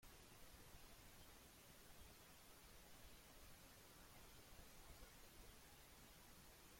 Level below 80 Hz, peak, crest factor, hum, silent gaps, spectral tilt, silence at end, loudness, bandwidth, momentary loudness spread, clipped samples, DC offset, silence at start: -70 dBFS; -48 dBFS; 16 dB; none; none; -3 dB/octave; 0 s; -64 LUFS; 16.5 kHz; 1 LU; under 0.1%; under 0.1%; 0 s